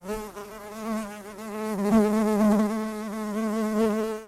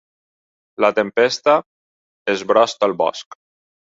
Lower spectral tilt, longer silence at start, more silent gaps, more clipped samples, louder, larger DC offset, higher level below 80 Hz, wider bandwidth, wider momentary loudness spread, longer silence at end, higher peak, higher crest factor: first, -6.5 dB/octave vs -3.5 dB/octave; second, 0.05 s vs 0.8 s; second, none vs 1.66-2.25 s; neither; second, -26 LUFS vs -18 LUFS; neither; first, -54 dBFS vs -66 dBFS; first, 15 kHz vs 7.8 kHz; first, 16 LU vs 8 LU; second, 0 s vs 0.75 s; second, -8 dBFS vs -2 dBFS; about the same, 18 dB vs 18 dB